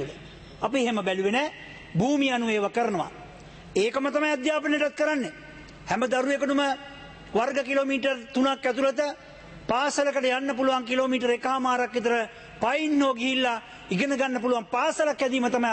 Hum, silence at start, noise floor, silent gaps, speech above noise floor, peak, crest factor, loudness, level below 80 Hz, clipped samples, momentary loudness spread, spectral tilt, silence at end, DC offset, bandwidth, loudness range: none; 0 s; -45 dBFS; none; 20 dB; -12 dBFS; 14 dB; -26 LUFS; -58 dBFS; under 0.1%; 12 LU; -4.5 dB/octave; 0 s; under 0.1%; 8.8 kHz; 2 LU